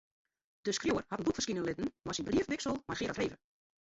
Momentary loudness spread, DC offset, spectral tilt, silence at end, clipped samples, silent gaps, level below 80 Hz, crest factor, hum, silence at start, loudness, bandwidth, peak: 6 LU; under 0.1%; -4 dB/octave; 0.5 s; under 0.1%; none; -60 dBFS; 16 dB; none; 0.65 s; -36 LUFS; 8 kHz; -22 dBFS